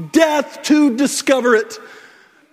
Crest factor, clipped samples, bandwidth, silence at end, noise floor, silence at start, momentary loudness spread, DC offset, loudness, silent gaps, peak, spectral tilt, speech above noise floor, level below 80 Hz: 16 dB; under 0.1%; 16 kHz; 0.6 s; -47 dBFS; 0 s; 9 LU; under 0.1%; -15 LUFS; none; 0 dBFS; -3.5 dB/octave; 32 dB; -64 dBFS